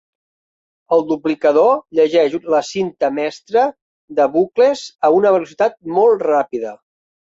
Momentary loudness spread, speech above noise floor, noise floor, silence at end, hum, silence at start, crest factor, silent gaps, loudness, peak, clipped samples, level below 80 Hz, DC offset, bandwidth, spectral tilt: 8 LU; over 75 dB; under -90 dBFS; 0.45 s; none; 0.9 s; 14 dB; 3.82-4.08 s; -16 LUFS; -2 dBFS; under 0.1%; -64 dBFS; under 0.1%; 7.8 kHz; -5.5 dB/octave